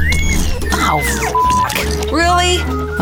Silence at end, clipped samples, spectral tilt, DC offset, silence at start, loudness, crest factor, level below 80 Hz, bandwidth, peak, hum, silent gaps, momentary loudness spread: 0 s; under 0.1%; -4 dB/octave; under 0.1%; 0 s; -15 LUFS; 12 dB; -20 dBFS; 19.5 kHz; -2 dBFS; none; none; 5 LU